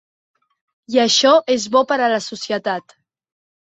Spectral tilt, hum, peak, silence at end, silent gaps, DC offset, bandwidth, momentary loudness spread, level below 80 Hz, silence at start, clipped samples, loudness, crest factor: -2 dB/octave; none; -2 dBFS; 0.8 s; none; under 0.1%; 8.2 kHz; 11 LU; -68 dBFS; 0.9 s; under 0.1%; -17 LUFS; 18 dB